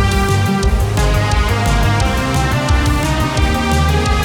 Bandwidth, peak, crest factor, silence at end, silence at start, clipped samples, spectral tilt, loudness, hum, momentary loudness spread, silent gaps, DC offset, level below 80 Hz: 18.5 kHz; -2 dBFS; 12 dB; 0 s; 0 s; under 0.1%; -5 dB/octave; -15 LUFS; none; 1 LU; none; under 0.1%; -18 dBFS